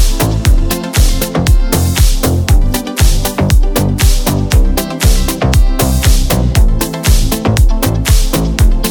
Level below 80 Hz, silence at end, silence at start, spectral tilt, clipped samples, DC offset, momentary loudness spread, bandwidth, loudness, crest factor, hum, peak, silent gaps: -12 dBFS; 0 s; 0 s; -5 dB/octave; under 0.1%; under 0.1%; 2 LU; over 20 kHz; -12 LUFS; 10 dB; none; 0 dBFS; none